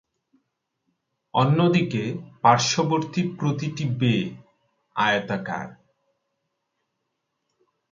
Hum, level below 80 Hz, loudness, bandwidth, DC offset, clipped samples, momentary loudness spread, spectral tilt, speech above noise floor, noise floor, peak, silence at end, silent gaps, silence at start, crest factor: none; -64 dBFS; -23 LUFS; 7.6 kHz; under 0.1%; under 0.1%; 13 LU; -5 dB/octave; 56 dB; -78 dBFS; -4 dBFS; 2.2 s; none; 1.35 s; 22 dB